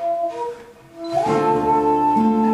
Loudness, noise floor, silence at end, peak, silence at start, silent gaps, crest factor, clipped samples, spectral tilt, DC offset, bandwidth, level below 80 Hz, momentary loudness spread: -19 LUFS; -39 dBFS; 0 s; -6 dBFS; 0 s; none; 12 dB; under 0.1%; -7 dB/octave; under 0.1%; 12.5 kHz; -50 dBFS; 13 LU